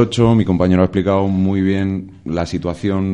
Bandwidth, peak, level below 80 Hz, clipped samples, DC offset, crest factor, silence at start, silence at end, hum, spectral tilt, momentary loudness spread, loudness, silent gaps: 10 kHz; 0 dBFS; -40 dBFS; under 0.1%; under 0.1%; 16 dB; 0 s; 0 s; none; -7.5 dB/octave; 9 LU; -17 LUFS; none